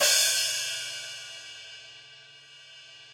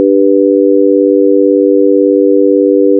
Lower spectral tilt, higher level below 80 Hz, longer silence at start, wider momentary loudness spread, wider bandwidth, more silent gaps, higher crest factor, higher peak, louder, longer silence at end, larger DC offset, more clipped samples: second, 3 dB/octave vs -5.5 dB/octave; first, -82 dBFS vs under -90 dBFS; about the same, 0 s vs 0 s; first, 26 LU vs 0 LU; first, 16.5 kHz vs 0.6 kHz; neither; first, 20 dB vs 8 dB; second, -10 dBFS vs 0 dBFS; second, -26 LUFS vs -8 LUFS; about the same, 0 s vs 0 s; neither; second, under 0.1% vs 0.2%